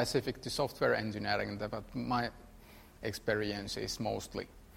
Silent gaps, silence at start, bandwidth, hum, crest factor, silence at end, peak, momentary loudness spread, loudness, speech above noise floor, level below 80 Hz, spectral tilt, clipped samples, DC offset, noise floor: none; 0 s; 16 kHz; none; 20 dB; 0 s; -16 dBFS; 9 LU; -36 LUFS; 20 dB; -56 dBFS; -4.5 dB/octave; under 0.1%; under 0.1%; -56 dBFS